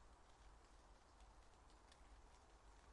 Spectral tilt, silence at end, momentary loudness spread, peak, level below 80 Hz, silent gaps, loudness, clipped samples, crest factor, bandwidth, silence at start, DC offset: -4 dB/octave; 0 s; 2 LU; -54 dBFS; -70 dBFS; none; -69 LUFS; under 0.1%; 14 dB; 11 kHz; 0 s; under 0.1%